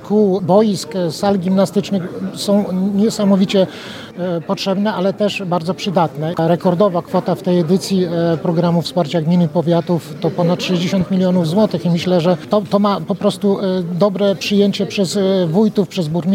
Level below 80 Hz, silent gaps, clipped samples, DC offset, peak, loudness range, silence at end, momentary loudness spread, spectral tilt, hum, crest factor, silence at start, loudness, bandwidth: -56 dBFS; none; under 0.1%; under 0.1%; 0 dBFS; 1 LU; 0 s; 5 LU; -6.5 dB/octave; none; 16 dB; 0 s; -16 LUFS; 15.5 kHz